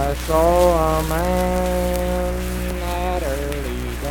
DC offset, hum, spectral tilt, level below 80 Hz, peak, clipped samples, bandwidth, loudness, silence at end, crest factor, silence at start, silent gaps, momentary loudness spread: under 0.1%; none; -5.5 dB/octave; -26 dBFS; -4 dBFS; under 0.1%; 19 kHz; -20 LUFS; 0 s; 16 dB; 0 s; none; 10 LU